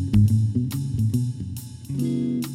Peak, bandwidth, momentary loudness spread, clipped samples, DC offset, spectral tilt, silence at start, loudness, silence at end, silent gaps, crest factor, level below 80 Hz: -6 dBFS; 16 kHz; 14 LU; under 0.1%; under 0.1%; -8 dB/octave; 0 s; -24 LUFS; 0 s; none; 16 dB; -42 dBFS